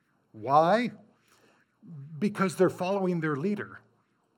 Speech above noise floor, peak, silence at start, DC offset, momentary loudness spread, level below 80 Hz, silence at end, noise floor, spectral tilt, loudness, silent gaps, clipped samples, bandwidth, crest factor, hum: 42 dB; -8 dBFS; 0.35 s; under 0.1%; 20 LU; -80 dBFS; 0.6 s; -70 dBFS; -6.5 dB/octave; -27 LUFS; none; under 0.1%; 16.5 kHz; 20 dB; none